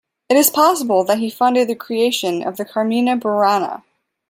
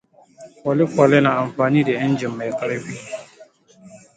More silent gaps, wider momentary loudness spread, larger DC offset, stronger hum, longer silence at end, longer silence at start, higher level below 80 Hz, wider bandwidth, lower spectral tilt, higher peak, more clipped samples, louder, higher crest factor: neither; second, 8 LU vs 17 LU; neither; neither; first, 0.5 s vs 0.2 s; about the same, 0.3 s vs 0.4 s; second, -68 dBFS vs -62 dBFS; first, 16.5 kHz vs 9.2 kHz; second, -3.5 dB/octave vs -7 dB/octave; about the same, 0 dBFS vs -2 dBFS; neither; about the same, -17 LUFS vs -19 LUFS; about the same, 16 dB vs 20 dB